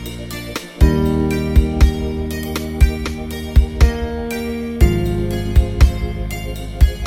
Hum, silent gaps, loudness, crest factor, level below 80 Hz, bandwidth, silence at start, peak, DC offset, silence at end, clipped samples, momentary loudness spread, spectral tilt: none; none; -18 LUFS; 16 dB; -18 dBFS; 16.5 kHz; 0 s; 0 dBFS; under 0.1%; 0 s; under 0.1%; 11 LU; -6.5 dB/octave